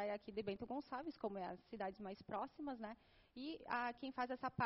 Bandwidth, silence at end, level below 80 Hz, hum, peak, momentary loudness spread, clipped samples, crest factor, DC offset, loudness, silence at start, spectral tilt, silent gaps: 5.8 kHz; 0 s; -76 dBFS; none; -26 dBFS; 9 LU; under 0.1%; 20 dB; under 0.1%; -48 LUFS; 0 s; -4 dB/octave; none